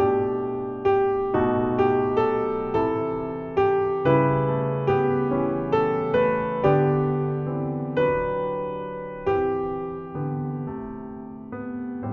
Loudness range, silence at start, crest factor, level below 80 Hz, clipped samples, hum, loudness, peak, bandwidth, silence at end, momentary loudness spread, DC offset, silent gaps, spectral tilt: 6 LU; 0 s; 16 dB; -50 dBFS; under 0.1%; none; -24 LUFS; -6 dBFS; 4.8 kHz; 0 s; 11 LU; under 0.1%; none; -7 dB/octave